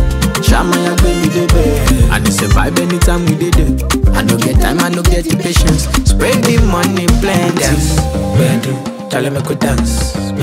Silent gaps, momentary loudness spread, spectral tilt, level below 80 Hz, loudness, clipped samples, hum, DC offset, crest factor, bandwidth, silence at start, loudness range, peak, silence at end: none; 4 LU; -5 dB/octave; -16 dBFS; -12 LUFS; under 0.1%; none; under 0.1%; 12 dB; 16.5 kHz; 0 s; 2 LU; 0 dBFS; 0 s